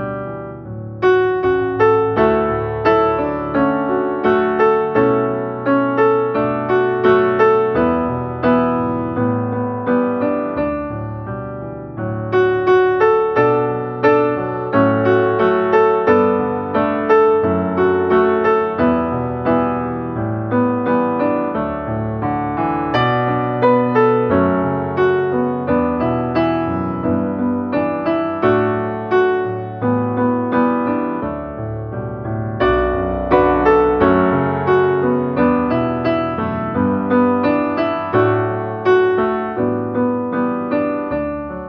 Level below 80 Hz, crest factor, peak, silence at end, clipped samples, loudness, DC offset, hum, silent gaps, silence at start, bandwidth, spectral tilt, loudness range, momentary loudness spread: -42 dBFS; 16 dB; -2 dBFS; 0 s; under 0.1%; -17 LUFS; under 0.1%; none; none; 0 s; 6.2 kHz; -9 dB/octave; 4 LU; 8 LU